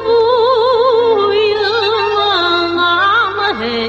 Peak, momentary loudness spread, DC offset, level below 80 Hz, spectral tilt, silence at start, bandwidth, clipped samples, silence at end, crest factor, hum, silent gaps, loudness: -2 dBFS; 3 LU; under 0.1%; -48 dBFS; -4.5 dB/octave; 0 s; 7.8 kHz; under 0.1%; 0 s; 12 dB; 50 Hz at -40 dBFS; none; -12 LUFS